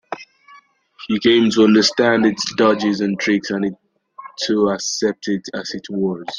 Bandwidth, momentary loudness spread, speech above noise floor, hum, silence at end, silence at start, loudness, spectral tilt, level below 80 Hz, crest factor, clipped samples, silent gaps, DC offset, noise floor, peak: 10 kHz; 14 LU; 32 dB; none; 0 s; 0.1 s; -17 LUFS; -4 dB/octave; -58 dBFS; 16 dB; under 0.1%; none; under 0.1%; -49 dBFS; -2 dBFS